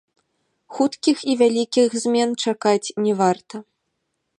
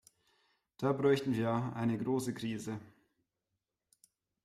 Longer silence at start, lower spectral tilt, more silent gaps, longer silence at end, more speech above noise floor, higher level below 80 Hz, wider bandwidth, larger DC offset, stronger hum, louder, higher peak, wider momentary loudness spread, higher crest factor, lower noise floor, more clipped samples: about the same, 0.7 s vs 0.8 s; second, -4.5 dB/octave vs -6.5 dB/octave; neither; second, 0.75 s vs 1.6 s; about the same, 55 dB vs 54 dB; about the same, -74 dBFS vs -72 dBFS; second, 11.5 kHz vs 15.5 kHz; neither; neither; first, -20 LUFS vs -34 LUFS; first, -4 dBFS vs -18 dBFS; about the same, 10 LU vs 11 LU; about the same, 18 dB vs 18 dB; second, -75 dBFS vs -88 dBFS; neither